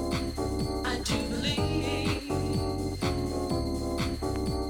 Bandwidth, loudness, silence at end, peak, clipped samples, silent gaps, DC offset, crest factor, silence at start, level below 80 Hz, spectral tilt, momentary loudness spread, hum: 19 kHz; -30 LUFS; 0 s; -16 dBFS; under 0.1%; none; under 0.1%; 14 dB; 0 s; -38 dBFS; -5.5 dB/octave; 3 LU; none